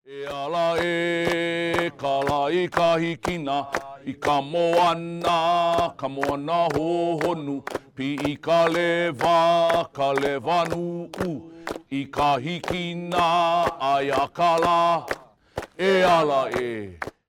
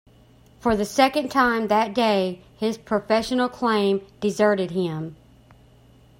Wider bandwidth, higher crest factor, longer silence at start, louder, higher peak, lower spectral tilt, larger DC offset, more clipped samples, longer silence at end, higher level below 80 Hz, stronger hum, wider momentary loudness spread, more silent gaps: about the same, 16 kHz vs 16.5 kHz; about the same, 16 dB vs 20 dB; second, 0.1 s vs 0.65 s; about the same, -23 LUFS vs -22 LUFS; second, -8 dBFS vs -4 dBFS; about the same, -5 dB/octave vs -5 dB/octave; neither; neither; second, 0.2 s vs 1.05 s; about the same, -54 dBFS vs -54 dBFS; neither; first, 11 LU vs 8 LU; neither